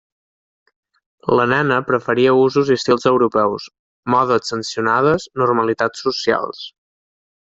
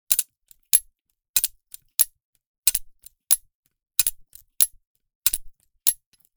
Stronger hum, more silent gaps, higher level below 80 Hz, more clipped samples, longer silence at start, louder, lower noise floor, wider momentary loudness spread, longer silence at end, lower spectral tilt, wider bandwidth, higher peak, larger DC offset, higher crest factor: neither; second, 3.79-4.03 s vs 1.01-1.05 s, 1.29-1.34 s, 2.25-2.33 s, 2.46-2.63 s, 3.55-3.63 s, 4.87-4.95 s, 5.15-5.22 s; about the same, -56 dBFS vs -54 dBFS; neither; first, 1.25 s vs 0.1 s; first, -17 LUFS vs -22 LUFS; first, under -90 dBFS vs -64 dBFS; first, 13 LU vs 7 LU; first, 0.75 s vs 0.45 s; first, -5.5 dB/octave vs 3 dB/octave; second, 7.8 kHz vs over 20 kHz; about the same, 0 dBFS vs 0 dBFS; neither; second, 18 dB vs 26 dB